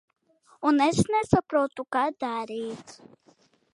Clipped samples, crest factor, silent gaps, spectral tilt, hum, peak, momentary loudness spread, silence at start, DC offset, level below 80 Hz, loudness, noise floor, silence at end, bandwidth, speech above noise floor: under 0.1%; 22 dB; none; -6 dB/octave; none; -6 dBFS; 12 LU; 0.6 s; under 0.1%; -54 dBFS; -26 LUFS; -62 dBFS; 0.8 s; 11.5 kHz; 37 dB